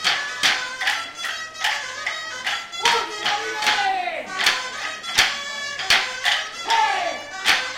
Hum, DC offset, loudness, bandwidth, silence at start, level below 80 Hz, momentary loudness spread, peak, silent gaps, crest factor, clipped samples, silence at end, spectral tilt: none; under 0.1%; -21 LUFS; 17 kHz; 0 s; -58 dBFS; 8 LU; -2 dBFS; none; 22 dB; under 0.1%; 0 s; 1 dB/octave